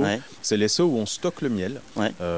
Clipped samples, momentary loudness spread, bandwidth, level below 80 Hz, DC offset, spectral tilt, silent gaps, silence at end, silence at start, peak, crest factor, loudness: under 0.1%; 7 LU; 8 kHz; -52 dBFS; 0.4%; -4.5 dB/octave; none; 0 s; 0 s; -10 dBFS; 16 dB; -25 LUFS